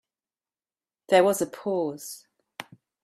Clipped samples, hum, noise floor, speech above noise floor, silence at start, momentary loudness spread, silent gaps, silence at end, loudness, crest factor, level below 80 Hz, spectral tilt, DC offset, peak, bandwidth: under 0.1%; none; under -90 dBFS; over 66 dB; 1.1 s; 22 LU; none; 0.4 s; -24 LUFS; 22 dB; -76 dBFS; -4 dB/octave; under 0.1%; -8 dBFS; 15.5 kHz